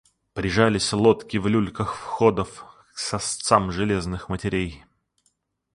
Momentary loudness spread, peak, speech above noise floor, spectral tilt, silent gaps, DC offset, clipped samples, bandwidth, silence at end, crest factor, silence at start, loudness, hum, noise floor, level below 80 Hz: 12 LU; -2 dBFS; 48 dB; -5 dB/octave; none; under 0.1%; under 0.1%; 11.5 kHz; 0.95 s; 22 dB; 0.35 s; -23 LUFS; none; -70 dBFS; -44 dBFS